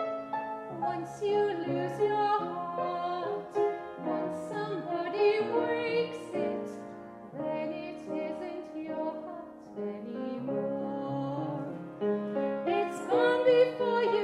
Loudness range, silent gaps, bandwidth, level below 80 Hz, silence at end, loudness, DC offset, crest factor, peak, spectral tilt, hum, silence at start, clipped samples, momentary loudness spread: 7 LU; none; 11.5 kHz; -74 dBFS; 0 s; -32 LUFS; under 0.1%; 18 dB; -14 dBFS; -6.5 dB/octave; none; 0 s; under 0.1%; 12 LU